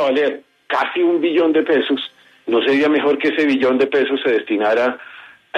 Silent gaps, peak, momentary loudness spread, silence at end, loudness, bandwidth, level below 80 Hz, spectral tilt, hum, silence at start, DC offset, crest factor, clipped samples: none; -4 dBFS; 8 LU; 0 s; -17 LUFS; 8.8 kHz; -70 dBFS; -5.5 dB/octave; none; 0 s; under 0.1%; 12 dB; under 0.1%